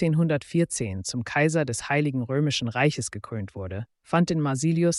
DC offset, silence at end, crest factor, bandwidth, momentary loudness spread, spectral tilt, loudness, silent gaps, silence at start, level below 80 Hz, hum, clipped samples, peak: under 0.1%; 0 s; 16 dB; 11.5 kHz; 11 LU; -5.5 dB/octave; -26 LUFS; none; 0 s; -58 dBFS; none; under 0.1%; -8 dBFS